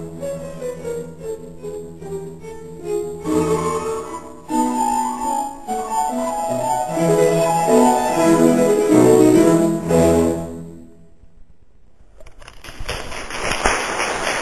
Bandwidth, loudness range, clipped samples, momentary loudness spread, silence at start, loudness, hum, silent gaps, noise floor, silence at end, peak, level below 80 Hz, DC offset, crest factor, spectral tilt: 16 kHz; 12 LU; under 0.1%; 18 LU; 0 s; -18 LUFS; none; none; -51 dBFS; 0 s; 0 dBFS; -40 dBFS; 0.7%; 18 dB; -5 dB/octave